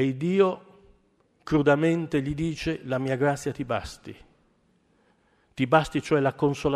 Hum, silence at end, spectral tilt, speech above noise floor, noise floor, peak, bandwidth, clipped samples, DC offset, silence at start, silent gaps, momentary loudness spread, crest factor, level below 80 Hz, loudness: none; 0 s; -6.5 dB/octave; 41 dB; -66 dBFS; -6 dBFS; 13.5 kHz; under 0.1%; under 0.1%; 0 s; none; 18 LU; 20 dB; -52 dBFS; -25 LUFS